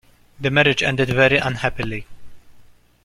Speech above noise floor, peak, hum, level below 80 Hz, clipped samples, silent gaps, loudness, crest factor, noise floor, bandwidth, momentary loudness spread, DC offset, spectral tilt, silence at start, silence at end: 28 dB; 0 dBFS; none; -42 dBFS; under 0.1%; none; -18 LUFS; 20 dB; -47 dBFS; 13.5 kHz; 13 LU; under 0.1%; -5 dB/octave; 0.4 s; 0.4 s